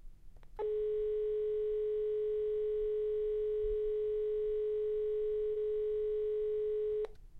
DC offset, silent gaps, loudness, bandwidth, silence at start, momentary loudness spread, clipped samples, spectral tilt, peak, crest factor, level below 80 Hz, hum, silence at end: under 0.1%; none; -35 LUFS; 4 kHz; 0.05 s; 0 LU; under 0.1%; -7.5 dB/octave; -26 dBFS; 8 dB; -54 dBFS; none; 0 s